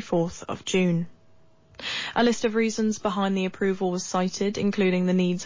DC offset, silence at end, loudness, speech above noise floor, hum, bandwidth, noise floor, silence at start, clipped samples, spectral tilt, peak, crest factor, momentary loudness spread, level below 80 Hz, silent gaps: under 0.1%; 0 s; -25 LUFS; 34 dB; none; 7.6 kHz; -58 dBFS; 0 s; under 0.1%; -5.5 dB/octave; -12 dBFS; 12 dB; 7 LU; -58 dBFS; none